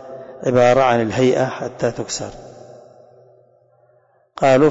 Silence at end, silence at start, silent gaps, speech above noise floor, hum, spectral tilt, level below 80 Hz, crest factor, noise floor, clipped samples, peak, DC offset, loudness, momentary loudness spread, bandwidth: 0 s; 0 s; none; 41 dB; none; -5.5 dB/octave; -52 dBFS; 14 dB; -57 dBFS; under 0.1%; -4 dBFS; under 0.1%; -17 LUFS; 20 LU; 8 kHz